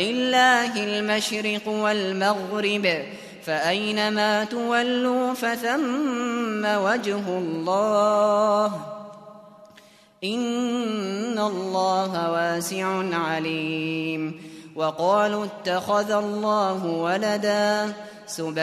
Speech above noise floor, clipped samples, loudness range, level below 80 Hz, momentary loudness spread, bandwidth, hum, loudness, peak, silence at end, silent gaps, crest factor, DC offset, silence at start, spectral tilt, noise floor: 29 dB; under 0.1%; 3 LU; -70 dBFS; 9 LU; 14 kHz; none; -23 LUFS; -6 dBFS; 0 s; none; 18 dB; under 0.1%; 0 s; -4 dB/octave; -52 dBFS